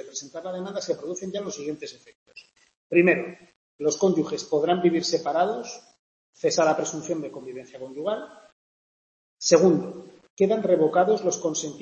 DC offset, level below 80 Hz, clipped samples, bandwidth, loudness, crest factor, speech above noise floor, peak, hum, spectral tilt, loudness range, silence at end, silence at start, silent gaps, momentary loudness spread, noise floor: under 0.1%; -72 dBFS; under 0.1%; 8.4 kHz; -24 LUFS; 22 dB; 28 dB; -4 dBFS; none; -4.5 dB/octave; 5 LU; 0 s; 0 s; 2.15-2.26 s, 2.77-2.90 s, 3.56-3.79 s, 5.99-6.33 s, 8.52-9.37 s, 10.30-10.37 s; 18 LU; -52 dBFS